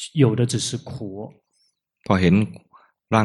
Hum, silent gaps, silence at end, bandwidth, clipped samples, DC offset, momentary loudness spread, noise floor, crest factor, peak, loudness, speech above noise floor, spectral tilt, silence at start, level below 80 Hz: none; none; 0 s; 12 kHz; under 0.1%; under 0.1%; 19 LU; -68 dBFS; 20 dB; -2 dBFS; -21 LUFS; 48 dB; -6 dB/octave; 0 s; -52 dBFS